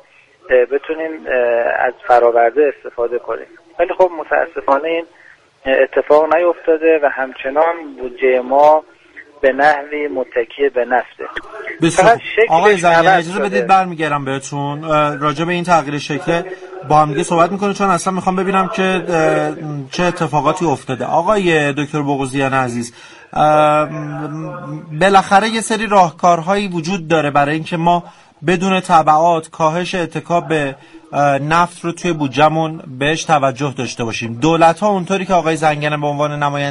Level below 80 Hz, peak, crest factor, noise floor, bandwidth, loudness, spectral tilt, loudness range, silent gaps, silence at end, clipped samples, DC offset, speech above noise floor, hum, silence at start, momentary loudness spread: -48 dBFS; 0 dBFS; 16 dB; -43 dBFS; 11.5 kHz; -15 LUFS; -5.5 dB/octave; 3 LU; none; 0 s; under 0.1%; under 0.1%; 28 dB; none; 0.5 s; 11 LU